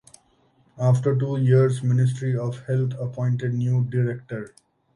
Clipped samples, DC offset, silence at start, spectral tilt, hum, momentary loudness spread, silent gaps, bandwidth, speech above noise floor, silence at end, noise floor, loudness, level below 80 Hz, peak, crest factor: under 0.1%; under 0.1%; 0.75 s; -8.5 dB/octave; none; 9 LU; none; 10.5 kHz; 40 dB; 0.5 s; -62 dBFS; -23 LUFS; -60 dBFS; -6 dBFS; 16 dB